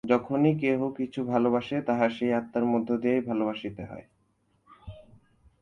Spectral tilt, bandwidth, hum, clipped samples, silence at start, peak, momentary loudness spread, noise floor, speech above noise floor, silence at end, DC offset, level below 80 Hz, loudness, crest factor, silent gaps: -8.5 dB/octave; 7 kHz; none; under 0.1%; 0.05 s; -8 dBFS; 18 LU; -70 dBFS; 43 dB; 0.6 s; under 0.1%; -60 dBFS; -27 LUFS; 20 dB; none